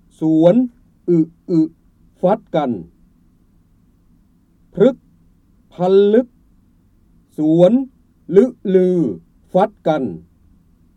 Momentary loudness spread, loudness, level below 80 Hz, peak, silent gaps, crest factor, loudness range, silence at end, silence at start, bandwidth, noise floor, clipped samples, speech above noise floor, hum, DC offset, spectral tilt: 17 LU; -16 LUFS; -56 dBFS; 0 dBFS; none; 18 dB; 7 LU; 0.75 s; 0.2 s; 8.4 kHz; -54 dBFS; under 0.1%; 40 dB; none; under 0.1%; -9 dB/octave